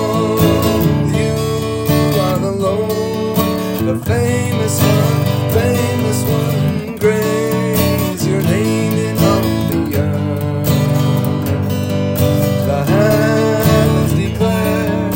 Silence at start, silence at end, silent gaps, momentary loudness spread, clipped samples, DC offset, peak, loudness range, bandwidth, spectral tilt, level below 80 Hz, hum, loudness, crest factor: 0 s; 0 s; none; 5 LU; under 0.1%; under 0.1%; 0 dBFS; 2 LU; 17 kHz; -6 dB/octave; -38 dBFS; none; -15 LUFS; 14 dB